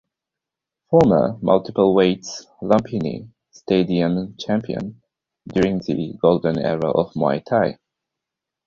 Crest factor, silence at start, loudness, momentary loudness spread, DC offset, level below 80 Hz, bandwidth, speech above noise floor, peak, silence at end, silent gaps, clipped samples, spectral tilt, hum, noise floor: 18 dB; 0.9 s; -20 LUFS; 12 LU; under 0.1%; -52 dBFS; 7.6 kHz; 67 dB; -2 dBFS; 0.9 s; none; under 0.1%; -7 dB/octave; none; -86 dBFS